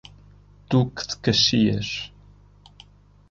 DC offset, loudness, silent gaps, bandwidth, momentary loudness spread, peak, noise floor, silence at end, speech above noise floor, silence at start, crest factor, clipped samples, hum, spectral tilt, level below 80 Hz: under 0.1%; -22 LUFS; none; 7.6 kHz; 13 LU; -6 dBFS; -51 dBFS; 1.25 s; 30 dB; 0.7 s; 18 dB; under 0.1%; 50 Hz at -45 dBFS; -5 dB/octave; -50 dBFS